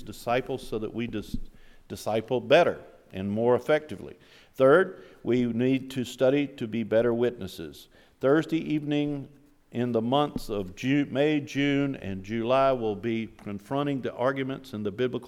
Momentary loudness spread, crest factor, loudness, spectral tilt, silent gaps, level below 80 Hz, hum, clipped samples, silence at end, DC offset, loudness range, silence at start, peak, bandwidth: 16 LU; 20 dB; -27 LUFS; -6.5 dB/octave; none; -52 dBFS; none; under 0.1%; 0 s; under 0.1%; 3 LU; 0 s; -8 dBFS; 15.5 kHz